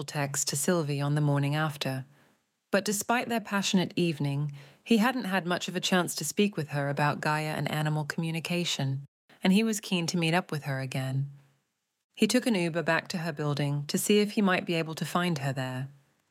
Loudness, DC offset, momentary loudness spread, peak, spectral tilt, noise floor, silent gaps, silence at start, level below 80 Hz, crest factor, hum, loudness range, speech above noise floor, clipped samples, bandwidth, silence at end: -29 LUFS; under 0.1%; 8 LU; -12 dBFS; -4.5 dB/octave; -78 dBFS; 9.08-9.29 s, 12.04-12.10 s; 0 s; -76 dBFS; 18 dB; none; 2 LU; 49 dB; under 0.1%; 16.5 kHz; 0.4 s